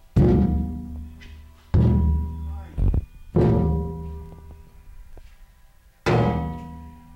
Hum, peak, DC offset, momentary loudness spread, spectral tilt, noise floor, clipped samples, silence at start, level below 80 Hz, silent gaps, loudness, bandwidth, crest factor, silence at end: none; -8 dBFS; under 0.1%; 22 LU; -9 dB/octave; -52 dBFS; under 0.1%; 0.15 s; -30 dBFS; none; -23 LUFS; 7.8 kHz; 14 dB; 0.2 s